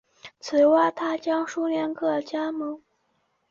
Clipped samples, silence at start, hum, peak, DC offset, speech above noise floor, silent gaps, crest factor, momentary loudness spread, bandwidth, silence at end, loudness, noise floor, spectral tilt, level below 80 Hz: under 0.1%; 0.25 s; none; -10 dBFS; under 0.1%; 47 dB; none; 16 dB; 14 LU; 7.4 kHz; 0.75 s; -24 LUFS; -71 dBFS; -4.5 dB/octave; -72 dBFS